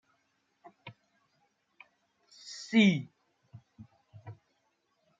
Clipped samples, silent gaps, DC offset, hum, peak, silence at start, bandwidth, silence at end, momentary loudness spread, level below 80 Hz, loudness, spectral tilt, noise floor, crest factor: under 0.1%; none; under 0.1%; none; -12 dBFS; 0.85 s; 7.8 kHz; 0.9 s; 28 LU; -78 dBFS; -27 LUFS; -5.5 dB/octave; -76 dBFS; 24 dB